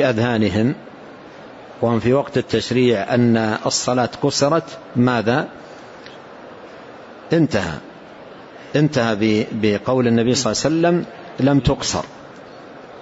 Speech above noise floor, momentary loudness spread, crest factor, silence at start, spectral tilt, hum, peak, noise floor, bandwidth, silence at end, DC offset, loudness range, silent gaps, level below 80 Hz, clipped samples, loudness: 21 dB; 22 LU; 16 dB; 0 s; -5.5 dB/octave; none; -4 dBFS; -39 dBFS; 8 kHz; 0 s; under 0.1%; 5 LU; none; -46 dBFS; under 0.1%; -18 LUFS